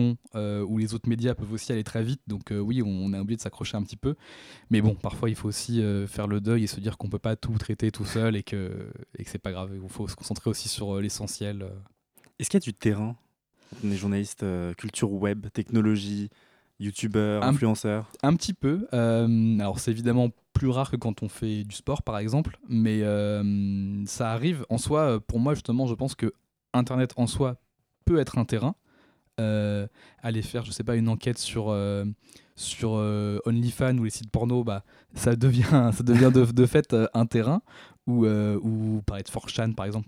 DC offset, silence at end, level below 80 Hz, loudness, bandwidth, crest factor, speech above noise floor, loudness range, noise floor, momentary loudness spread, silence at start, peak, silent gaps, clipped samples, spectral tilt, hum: under 0.1%; 0.05 s; -50 dBFS; -27 LUFS; 15 kHz; 20 dB; 37 dB; 8 LU; -63 dBFS; 11 LU; 0 s; -6 dBFS; none; under 0.1%; -6.5 dB/octave; none